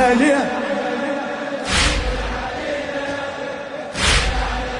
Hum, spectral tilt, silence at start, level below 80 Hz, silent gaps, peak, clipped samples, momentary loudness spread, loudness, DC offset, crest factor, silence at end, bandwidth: none; -3.5 dB/octave; 0 s; -28 dBFS; none; -4 dBFS; under 0.1%; 10 LU; -20 LUFS; under 0.1%; 16 dB; 0 s; 11 kHz